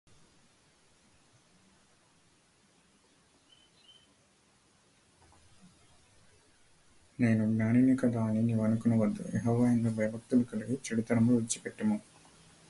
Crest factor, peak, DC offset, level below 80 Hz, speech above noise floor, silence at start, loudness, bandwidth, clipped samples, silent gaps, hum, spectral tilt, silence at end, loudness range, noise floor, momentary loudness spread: 18 dB; -16 dBFS; under 0.1%; -66 dBFS; 38 dB; 7.2 s; -30 LUFS; 11.5 kHz; under 0.1%; none; none; -7 dB/octave; 0.7 s; 5 LU; -67 dBFS; 8 LU